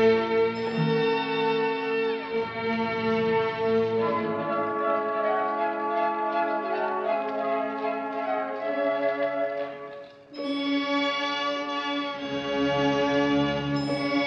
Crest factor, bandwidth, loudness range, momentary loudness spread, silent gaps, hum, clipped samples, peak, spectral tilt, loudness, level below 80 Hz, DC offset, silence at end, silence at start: 14 dB; 9 kHz; 3 LU; 6 LU; none; none; under 0.1%; -12 dBFS; -6 dB/octave; -26 LUFS; -60 dBFS; under 0.1%; 0 s; 0 s